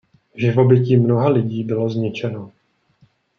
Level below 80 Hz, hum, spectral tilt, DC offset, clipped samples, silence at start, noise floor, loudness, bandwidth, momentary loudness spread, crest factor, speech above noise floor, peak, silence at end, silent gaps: -62 dBFS; none; -9.5 dB/octave; under 0.1%; under 0.1%; 0.35 s; -58 dBFS; -18 LUFS; 6.4 kHz; 12 LU; 16 dB; 41 dB; -2 dBFS; 0.9 s; none